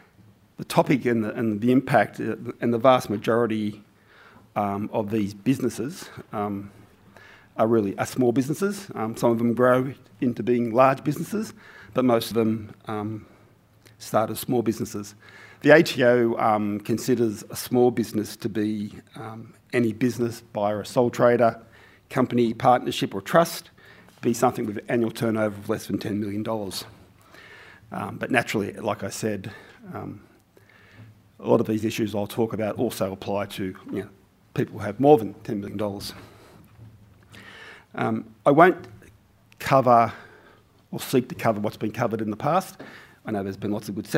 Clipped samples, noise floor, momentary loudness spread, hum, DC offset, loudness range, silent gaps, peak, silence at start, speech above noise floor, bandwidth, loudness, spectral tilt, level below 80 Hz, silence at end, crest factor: under 0.1%; -56 dBFS; 17 LU; none; under 0.1%; 7 LU; none; -2 dBFS; 0.6 s; 33 dB; 16 kHz; -24 LUFS; -6 dB/octave; -62 dBFS; 0 s; 22 dB